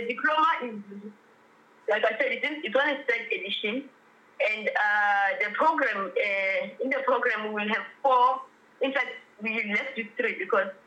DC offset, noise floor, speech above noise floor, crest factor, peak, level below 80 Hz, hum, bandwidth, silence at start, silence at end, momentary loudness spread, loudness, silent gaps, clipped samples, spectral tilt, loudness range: under 0.1%; -58 dBFS; 31 dB; 16 dB; -12 dBFS; under -90 dBFS; none; 8.8 kHz; 0 s; 0.15 s; 10 LU; -26 LUFS; none; under 0.1%; -4.5 dB/octave; 3 LU